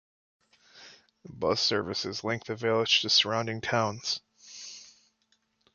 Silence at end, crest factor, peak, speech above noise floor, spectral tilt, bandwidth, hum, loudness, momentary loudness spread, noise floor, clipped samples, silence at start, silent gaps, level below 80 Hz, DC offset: 0.9 s; 22 dB; -10 dBFS; 44 dB; -3 dB/octave; 7.4 kHz; none; -27 LUFS; 20 LU; -73 dBFS; under 0.1%; 0.75 s; none; -64 dBFS; under 0.1%